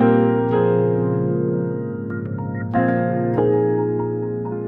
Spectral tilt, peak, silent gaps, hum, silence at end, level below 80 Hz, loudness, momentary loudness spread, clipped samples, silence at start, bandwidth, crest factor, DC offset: -12 dB/octave; -4 dBFS; none; none; 0 s; -56 dBFS; -20 LUFS; 9 LU; under 0.1%; 0 s; 4 kHz; 14 dB; 0.1%